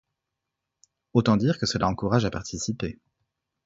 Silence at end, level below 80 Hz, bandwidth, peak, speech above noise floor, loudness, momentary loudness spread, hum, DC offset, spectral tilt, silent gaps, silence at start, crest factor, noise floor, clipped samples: 0.75 s; -50 dBFS; 8 kHz; -6 dBFS; 60 dB; -25 LUFS; 9 LU; none; under 0.1%; -5.5 dB/octave; none; 1.15 s; 22 dB; -84 dBFS; under 0.1%